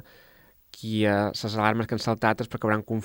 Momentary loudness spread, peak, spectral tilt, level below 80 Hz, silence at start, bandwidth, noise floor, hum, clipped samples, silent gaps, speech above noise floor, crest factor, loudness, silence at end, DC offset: 4 LU; -6 dBFS; -6 dB/octave; -60 dBFS; 0.75 s; 17 kHz; -57 dBFS; none; under 0.1%; none; 31 dB; 22 dB; -26 LUFS; 0 s; under 0.1%